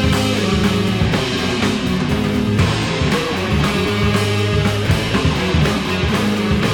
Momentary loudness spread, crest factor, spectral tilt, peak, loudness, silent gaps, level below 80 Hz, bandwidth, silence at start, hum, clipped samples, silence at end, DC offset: 2 LU; 12 dB; -5.5 dB/octave; -4 dBFS; -17 LUFS; none; -28 dBFS; 18.5 kHz; 0 s; none; under 0.1%; 0 s; under 0.1%